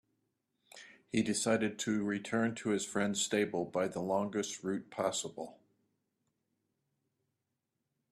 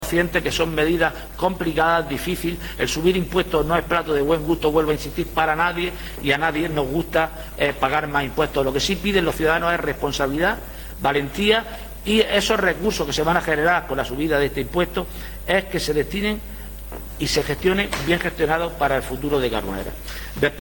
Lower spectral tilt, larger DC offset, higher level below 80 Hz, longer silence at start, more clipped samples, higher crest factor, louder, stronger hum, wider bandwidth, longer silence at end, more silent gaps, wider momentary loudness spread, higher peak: about the same, -4 dB/octave vs -4.5 dB/octave; neither; second, -74 dBFS vs -36 dBFS; first, 0.75 s vs 0 s; neither; about the same, 20 dB vs 16 dB; second, -35 LUFS vs -21 LUFS; neither; second, 14 kHz vs 17.5 kHz; first, 2.6 s vs 0 s; neither; first, 12 LU vs 8 LU; second, -16 dBFS vs -6 dBFS